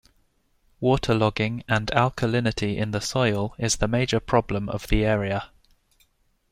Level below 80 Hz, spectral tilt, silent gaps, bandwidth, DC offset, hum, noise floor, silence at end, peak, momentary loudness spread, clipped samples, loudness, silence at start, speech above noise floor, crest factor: -38 dBFS; -5 dB/octave; none; 15 kHz; under 0.1%; none; -65 dBFS; 1.05 s; -4 dBFS; 6 LU; under 0.1%; -24 LUFS; 0.8 s; 42 dB; 20 dB